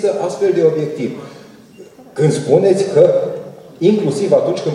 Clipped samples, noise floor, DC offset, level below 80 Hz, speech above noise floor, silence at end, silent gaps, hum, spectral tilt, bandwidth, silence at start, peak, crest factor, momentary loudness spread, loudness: under 0.1%; -40 dBFS; under 0.1%; -62 dBFS; 26 dB; 0 s; none; none; -7 dB/octave; 12 kHz; 0 s; 0 dBFS; 16 dB; 18 LU; -15 LUFS